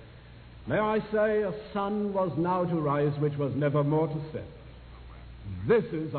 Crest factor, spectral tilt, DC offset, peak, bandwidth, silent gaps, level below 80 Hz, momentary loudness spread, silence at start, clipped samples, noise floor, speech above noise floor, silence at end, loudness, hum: 16 dB; -11.5 dB/octave; under 0.1%; -12 dBFS; 4.5 kHz; none; -52 dBFS; 21 LU; 0 s; under 0.1%; -49 dBFS; 21 dB; 0 s; -28 LUFS; none